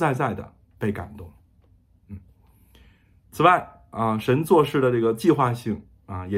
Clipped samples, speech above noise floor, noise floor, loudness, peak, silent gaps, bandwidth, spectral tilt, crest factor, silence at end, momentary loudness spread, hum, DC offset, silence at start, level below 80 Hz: under 0.1%; 36 dB; -58 dBFS; -22 LUFS; -2 dBFS; none; 16 kHz; -7 dB/octave; 22 dB; 0 s; 25 LU; none; under 0.1%; 0 s; -56 dBFS